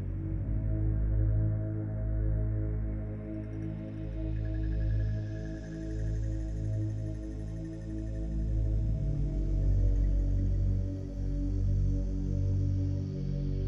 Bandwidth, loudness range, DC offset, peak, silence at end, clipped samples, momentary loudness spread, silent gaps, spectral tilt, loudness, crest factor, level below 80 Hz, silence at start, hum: 6.6 kHz; 4 LU; under 0.1%; -18 dBFS; 0 s; under 0.1%; 8 LU; none; -9.5 dB/octave; -33 LUFS; 12 dB; -34 dBFS; 0 s; none